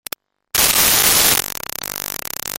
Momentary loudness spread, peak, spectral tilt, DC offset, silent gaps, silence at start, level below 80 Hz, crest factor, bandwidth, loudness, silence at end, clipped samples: 14 LU; 0 dBFS; 0 dB/octave; under 0.1%; none; 0.55 s; -42 dBFS; 18 dB; over 20 kHz; -14 LUFS; 0 s; under 0.1%